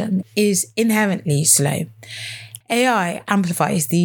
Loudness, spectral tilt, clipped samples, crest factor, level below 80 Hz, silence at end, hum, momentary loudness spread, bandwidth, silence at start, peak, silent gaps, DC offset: -18 LUFS; -4 dB/octave; under 0.1%; 18 dB; -64 dBFS; 0 s; none; 16 LU; over 20 kHz; 0 s; 0 dBFS; none; under 0.1%